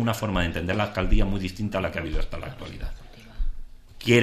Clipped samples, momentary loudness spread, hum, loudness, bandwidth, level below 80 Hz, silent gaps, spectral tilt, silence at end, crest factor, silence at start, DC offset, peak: under 0.1%; 14 LU; none; -28 LUFS; 14 kHz; -30 dBFS; none; -6 dB/octave; 0 s; 18 dB; 0 s; under 0.1%; -6 dBFS